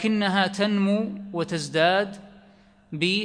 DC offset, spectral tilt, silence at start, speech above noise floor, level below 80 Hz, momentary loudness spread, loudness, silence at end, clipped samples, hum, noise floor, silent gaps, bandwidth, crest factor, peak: under 0.1%; -5 dB/octave; 0 s; 31 dB; -64 dBFS; 11 LU; -24 LUFS; 0 s; under 0.1%; none; -55 dBFS; none; 10.5 kHz; 18 dB; -6 dBFS